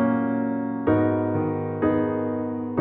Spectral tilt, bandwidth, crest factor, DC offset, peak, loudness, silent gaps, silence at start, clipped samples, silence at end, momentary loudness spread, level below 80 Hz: -9 dB/octave; 3.8 kHz; 14 dB; under 0.1%; -8 dBFS; -24 LUFS; none; 0 s; under 0.1%; 0 s; 5 LU; -54 dBFS